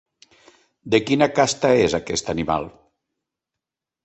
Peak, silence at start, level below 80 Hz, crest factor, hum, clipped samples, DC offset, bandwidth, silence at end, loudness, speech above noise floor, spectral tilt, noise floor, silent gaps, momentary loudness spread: -2 dBFS; 0.85 s; -50 dBFS; 20 dB; none; under 0.1%; under 0.1%; 8.4 kHz; 1.35 s; -20 LUFS; 66 dB; -4.5 dB/octave; -86 dBFS; none; 7 LU